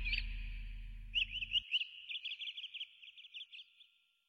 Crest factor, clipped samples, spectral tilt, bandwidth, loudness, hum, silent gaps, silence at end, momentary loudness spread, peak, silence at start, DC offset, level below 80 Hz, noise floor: 18 dB; under 0.1%; -1.5 dB/octave; 6.6 kHz; -40 LUFS; none; none; 0.45 s; 17 LU; -24 dBFS; 0 s; under 0.1%; -50 dBFS; -69 dBFS